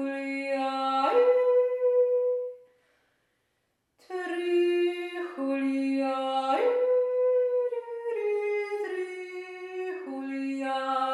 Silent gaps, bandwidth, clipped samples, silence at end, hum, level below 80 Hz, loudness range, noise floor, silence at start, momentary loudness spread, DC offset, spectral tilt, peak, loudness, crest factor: none; 11 kHz; under 0.1%; 0 s; none; -88 dBFS; 5 LU; -76 dBFS; 0 s; 12 LU; under 0.1%; -3.5 dB/octave; -12 dBFS; -28 LUFS; 16 dB